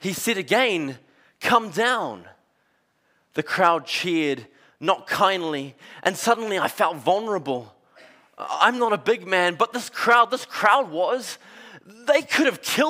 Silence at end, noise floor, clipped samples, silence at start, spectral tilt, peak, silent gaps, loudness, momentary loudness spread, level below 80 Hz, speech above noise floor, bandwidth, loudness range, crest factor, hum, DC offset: 0 s; -67 dBFS; under 0.1%; 0 s; -3 dB/octave; -4 dBFS; none; -22 LUFS; 13 LU; -72 dBFS; 45 dB; 16 kHz; 4 LU; 20 dB; none; under 0.1%